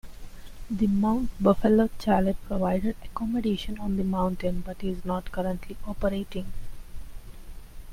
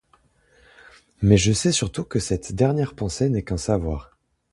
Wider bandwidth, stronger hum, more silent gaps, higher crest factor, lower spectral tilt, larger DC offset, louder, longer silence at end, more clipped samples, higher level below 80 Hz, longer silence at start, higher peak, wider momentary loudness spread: first, 16 kHz vs 11.5 kHz; neither; neither; about the same, 20 dB vs 22 dB; first, -7.5 dB/octave vs -5.5 dB/octave; neither; second, -27 LUFS vs -22 LUFS; second, 0 s vs 0.5 s; neither; about the same, -38 dBFS vs -38 dBFS; second, 0.05 s vs 1.2 s; second, -8 dBFS vs -2 dBFS; first, 17 LU vs 9 LU